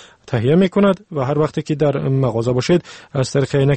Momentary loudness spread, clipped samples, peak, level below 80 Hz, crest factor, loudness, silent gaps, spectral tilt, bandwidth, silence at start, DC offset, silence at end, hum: 6 LU; under 0.1%; -4 dBFS; -48 dBFS; 14 dB; -18 LUFS; none; -7 dB/octave; 8.8 kHz; 0.25 s; under 0.1%; 0 s; none